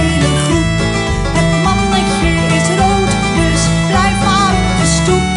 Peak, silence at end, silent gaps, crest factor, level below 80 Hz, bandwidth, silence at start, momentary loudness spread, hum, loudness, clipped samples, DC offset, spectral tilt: 0 dBFS; 0 s; none; 12 dB; -22 dBFS; 11.5 kHz; 0 s; 2 LU; none; -12 LUFS; under 0.1%; under 0.1%; -4.5 dB/octave